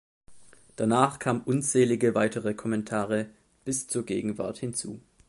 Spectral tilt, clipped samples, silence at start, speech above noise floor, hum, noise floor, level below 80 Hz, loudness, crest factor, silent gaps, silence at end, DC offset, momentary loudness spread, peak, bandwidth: -5 dB/octave; under 0.1%; 0.3 s; 27 dB; none; -54 dBFS; -64 dBFS; -27 LUFS; 20 dB; none; 0.3 s; under 0.1%; 9 LU; -8 dBFS; 12 kHz